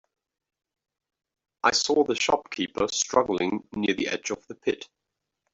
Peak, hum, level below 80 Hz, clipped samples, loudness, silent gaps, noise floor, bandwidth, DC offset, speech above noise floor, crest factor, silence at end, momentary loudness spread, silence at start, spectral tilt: -6 dBFS; none; -62 dBFS; under 0.1%; -26 LUFS; none; -84 dBFS; 8.2 kHz; under 0.1%; 58 dB; 22 dB; 0.7 s; 8 LU; 1.65 s; -2.5 dB/octave